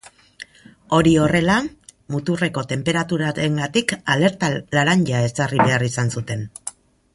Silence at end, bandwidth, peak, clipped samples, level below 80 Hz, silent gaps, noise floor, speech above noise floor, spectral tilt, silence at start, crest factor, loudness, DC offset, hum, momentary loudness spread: 0.45 s; 11.5 kHz; -2 dBFS; under 0.1%; -48 dBFS; none; -43 dBFS; 24 dB; -5.5 dB/octave; 0.05 s; 18 dB; -19 LUFS; under 0.1%; none; 16 LU